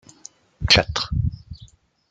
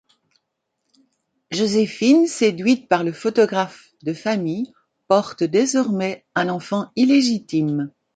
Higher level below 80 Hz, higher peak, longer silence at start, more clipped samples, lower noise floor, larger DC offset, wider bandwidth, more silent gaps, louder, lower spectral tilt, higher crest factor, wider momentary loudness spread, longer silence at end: first, -36 dBFS vs -66 dBFS; about the same, -2 dBFS vs -2 dBFS; second, 0.6 s vs 1.5 s; neither; second, -50 dBFS vs -76 dBFS; neither; about the same, 9.4 kHz vs 9.4 kHz; neither; about the same, -20 LUFS vs -20 LUFS; second, -3.5 dB/octave vs -5 dB/octave; about the same, 22 dB vs 18 dB; first, 15 LU vs 11 LU; first, 0.45 s vs 0.25 s